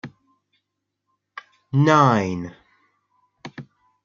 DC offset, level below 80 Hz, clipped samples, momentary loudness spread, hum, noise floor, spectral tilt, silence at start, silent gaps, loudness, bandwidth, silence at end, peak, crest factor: under 0.1%; -66 dBFS; under 0.1%; 27 LU; 50 Hz at -45 dBFS; -79 dBFS; -7 dB/octave; 0.05 s; none; -19 LUFS; 7.4 kHz; 0.4 s; -2 dBFS; 22 dB